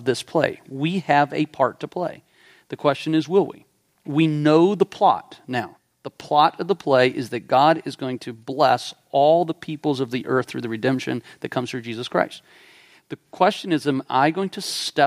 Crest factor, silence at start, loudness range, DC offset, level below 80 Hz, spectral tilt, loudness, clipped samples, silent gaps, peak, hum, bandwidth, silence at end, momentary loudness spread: 20 dB; 0 s; 5 LU; under 0.1%; -68 dBFS; -5.5 dB/octave; -22 LUFS; under 0.1%; none; -2 dBFS; none; 15.5 kHz; 0 s; 12 LU